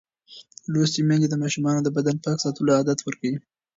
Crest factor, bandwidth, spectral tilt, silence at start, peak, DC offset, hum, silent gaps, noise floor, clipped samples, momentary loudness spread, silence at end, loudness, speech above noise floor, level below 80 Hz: 16 dB; 7.8 kHz; -5.5 dB/octave; 0.3 s; -8 dBFS; under 0.1%; none; none; -49 dBFS; under 0.1%; 9 LU; 0.35 s; -23 LUFS; 27 dB; -66 dBFS